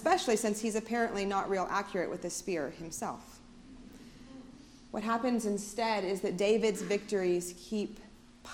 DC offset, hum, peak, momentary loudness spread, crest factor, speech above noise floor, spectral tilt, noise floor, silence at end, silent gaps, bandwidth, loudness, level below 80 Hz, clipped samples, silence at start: under 0.1%; none; -14 dBFS; 23 LU; 20 dB; 21 dB; -4 dB/octave; -53 dBFS; 0 s; none; 17 kHz; -33 LUFS; -60 dBFS; under 0.1%; 0 s